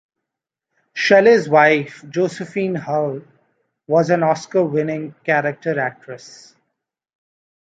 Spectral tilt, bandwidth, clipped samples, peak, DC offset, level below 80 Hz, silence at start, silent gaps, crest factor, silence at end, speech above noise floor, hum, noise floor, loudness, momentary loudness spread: -6 dB/octave; 9 kHz; under 0.1%; -2 dBFS; under 0.1%; -68 dBFS; 0.95 s; none; 18 dB; 1.35 s; 66 dB; none; -84 dBFS; -17 LUFS; 14 LU